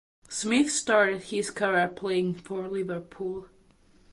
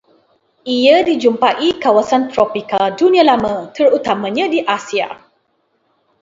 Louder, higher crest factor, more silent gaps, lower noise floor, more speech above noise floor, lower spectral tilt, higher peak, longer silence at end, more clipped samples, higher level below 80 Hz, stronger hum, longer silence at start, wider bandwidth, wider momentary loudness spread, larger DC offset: second, -27 LUFS vs -14 LUFS; about the same, 18 dB vs 14 dB; neither; second, -59 dBFS vs -63 dBFS; second, 32 dB vs 49 dB; about the same, -3.5 dB/octave vs -4.5 dB/octave; second, -10 dBFS vs 0 dBFS; second, 0.65 s vs 1.05 s; neither; second, -64 dBFS vs -54 dBFS; neither; second, 0.3 s vs 0.65 s; first, 11.5 kHz vs 7.8 kHz; first, 12 LU vs 9 LU; neither